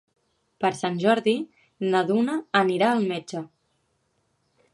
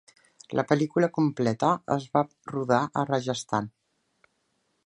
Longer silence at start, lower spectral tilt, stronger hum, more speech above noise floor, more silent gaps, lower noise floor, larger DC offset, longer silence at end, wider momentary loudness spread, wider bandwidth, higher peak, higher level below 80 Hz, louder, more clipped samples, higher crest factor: about the same, 0.6 s vs 0.5 s; about the same, -5.5 dB/octave vs -6.5 dB/octave; neither; about the same, 48 dB vs 48 dB; neither; about the same, -71 dBFS vs -74 dBFS; neither; first, 1.3 s vs 1.15 s; first, 14 LU vs 7 LU; about the same, 11.5 kHz vs 11 kHz; about the same, -4 dBFS vs -6 dBFS; second, -74 dBFS vs -68 dBFS; first, -24 LUFS vs -27 LUFS; neither; about the same, 22 dB vs 22 dB